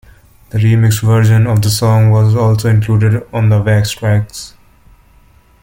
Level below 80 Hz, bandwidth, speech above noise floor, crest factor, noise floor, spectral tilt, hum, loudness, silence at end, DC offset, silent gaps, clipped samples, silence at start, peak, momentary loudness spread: -38 dBFS; 17 kHz; 36 dB; 10 dB; -46 dBFS; -6.5 dB/octave; none; -12 LUFS; 1.15 s; under 0.1%; none; under 0.1%; 0.55 s; 0 dBFS; 6 LU